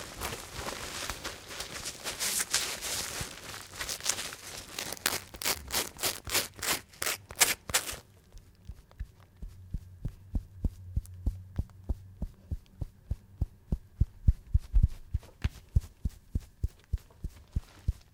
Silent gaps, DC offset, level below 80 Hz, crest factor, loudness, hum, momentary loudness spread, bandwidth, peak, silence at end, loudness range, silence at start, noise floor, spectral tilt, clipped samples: none; under 0.1%; -38 dBFS; 30 dB; -34 LUFS; none; 15 LU; 18 kHz; -4 dBFS; 0.15 s; 10 LU; 0 s; -54 dBFS; -2.5 dB/octave; under 0.1%